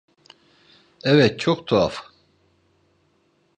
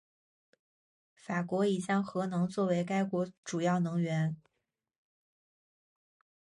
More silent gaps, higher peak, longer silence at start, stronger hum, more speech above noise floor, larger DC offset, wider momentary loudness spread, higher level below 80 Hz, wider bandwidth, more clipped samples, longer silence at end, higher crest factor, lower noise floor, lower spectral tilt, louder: second, none vs 3.38-3.43 s; first, -2 dBFS vs -20 dBFS; second, 1.05 s vs 1.25 s; neither; second, 45 dB vs 54 dB; neither; first, 10 LU vs 6 LU; first, -54 dBFS vs -76 dBFS; second, 9.6 kHz vs 11 kHz; neither; second, 1.6 s vs 2.1 s; first, 22 dB vs 16 dB; second, -64 dBFS vs -86 dBFS; about the same, -6.5 dB/octave vs -7 dB/octave; first, -20 LUFS vs -32 LUFS